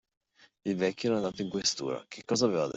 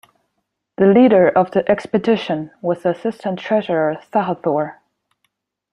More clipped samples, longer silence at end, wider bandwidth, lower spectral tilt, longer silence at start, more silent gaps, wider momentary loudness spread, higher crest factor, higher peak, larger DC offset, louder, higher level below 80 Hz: neither; second, 0.05 s vs 1 s; second, 8.2 kHz vs 10.5 kHz; second, -4 dB/octave vs -8 dB/octave; second, 0.65 s vs 0.8 s; neither; second, 9 LU vs 12 LU; about the same, 18 dB vs 16 dB; second, -14 dBFS vs -2 dBFS; neither; second, -31 LUFS vs -17 LUFS; second, -68 dBFS vs -60 dBFS